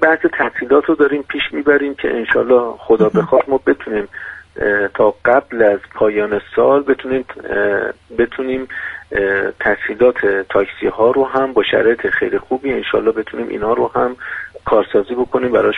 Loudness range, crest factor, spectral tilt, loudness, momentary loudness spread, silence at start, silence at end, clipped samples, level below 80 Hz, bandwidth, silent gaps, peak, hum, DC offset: 3 LU; 14 dB; -7.5 dB/octave; -16 LUFS; 9 LU; 0 s; 0 s; under 0.1%; -46 dBFS; 4.4 kHz; none; 0 dBFS; none; under 0.1%